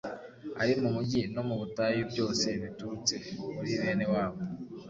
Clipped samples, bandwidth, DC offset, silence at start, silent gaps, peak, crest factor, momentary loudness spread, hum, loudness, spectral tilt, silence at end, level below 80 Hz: under 0.1%; 7.8 kHz; under 0.1%; 0.05 s; none; -14 dBFS; 18 dB; 10 LU; none; -32 LUFS; -4.5 dB/octave; 0 s; -60 dBFS